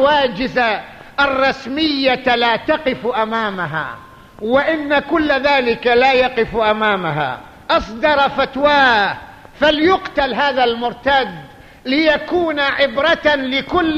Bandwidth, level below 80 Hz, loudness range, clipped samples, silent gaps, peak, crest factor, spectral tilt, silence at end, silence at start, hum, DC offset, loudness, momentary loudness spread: 11 kHz; -44 dBFS; 2 LU; under 0.1%; none; -2 dBFS; 14 dB; -5 dB/octave; 0 s; 0 s; none; under 0.1%; -16 LUFS; 9 LU